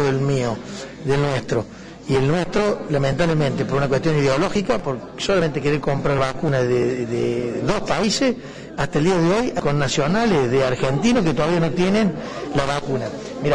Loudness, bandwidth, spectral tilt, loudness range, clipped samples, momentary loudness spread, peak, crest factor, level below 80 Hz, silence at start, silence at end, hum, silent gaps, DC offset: -20 LUFS; 10.5 kHz; -6 dB/octave; 2 LU; under 0.1%; 8 LU; -8 dBFS; 10 dB; -40 dBFS; 0 s; 0 s; none; none; 0.2%